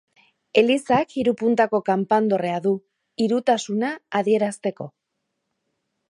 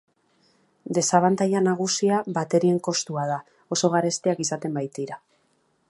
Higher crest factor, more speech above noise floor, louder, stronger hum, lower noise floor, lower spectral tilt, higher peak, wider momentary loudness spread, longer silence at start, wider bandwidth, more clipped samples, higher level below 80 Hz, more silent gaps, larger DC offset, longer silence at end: about the same, 20 dB vs 22 dB; first, 57 dB vs 44 dB; about the same, -22 LUFS vs -24 LUFS; neither; first, -78 dBFS vs -67 dBFS; about the same, -5.5 dB/octave vs -4.5 dB/octave; about the same, -4 dBFS vs -2 dBFS; about the same, 10 LU vs 11 LU; second, 0.55 s vs 0.85 s; about the same, 11 kHz vs 11.5 kHz; neither; first, -66 dBFS vs -72 dBFS; neither; neither; first, 1.25 s vs 0.7 s